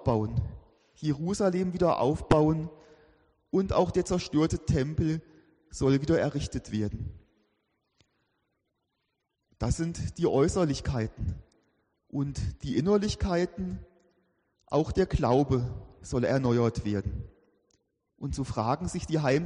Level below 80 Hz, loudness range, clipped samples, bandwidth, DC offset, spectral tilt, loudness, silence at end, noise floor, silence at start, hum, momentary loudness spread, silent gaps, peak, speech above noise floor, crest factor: -44 dBFS; 5 LU; under 0.1%; 10.5 kHz; under 0.1%; -7 dB/octave; -29 LUFS; 0 s; -80 dBFS; 0 s; none; 12 LU; none; -12 dBFS; 53 dB; 18 dB